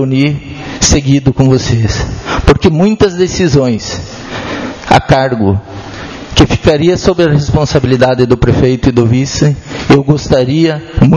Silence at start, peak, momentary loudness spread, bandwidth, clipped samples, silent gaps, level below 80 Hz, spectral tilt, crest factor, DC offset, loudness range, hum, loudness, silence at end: 0 s; 0 dBFS; 11 LU; 11 kHz; 1%; none; -24 dBFS; -5.5 dB/octave; 10 dB; under 0.1%; 3 LU; none; -10 LUFS; 0 s